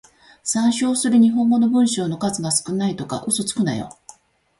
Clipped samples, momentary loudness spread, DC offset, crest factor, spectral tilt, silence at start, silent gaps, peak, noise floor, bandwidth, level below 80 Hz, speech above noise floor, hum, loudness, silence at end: under 0.1%; 10 LU; under 0.1%; 14 dB; -4.5 dB/octave; 0.45 s; none; -6 dBFS; -48 dBFS; 12 kHz; -58 dBFS; 29 dB; none; -19 LUFS; 0.7 s